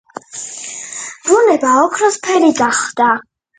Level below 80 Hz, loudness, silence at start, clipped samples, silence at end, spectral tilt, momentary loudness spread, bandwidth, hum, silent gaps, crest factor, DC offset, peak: -62 dBFS; -13 LUFS; 0.35 s; under 0.1%; 0.35 s; -2.5 dB/octave; 14 LU; 9.6 kHz; none; none; 14 dB; under 0.1%; 0 dBFS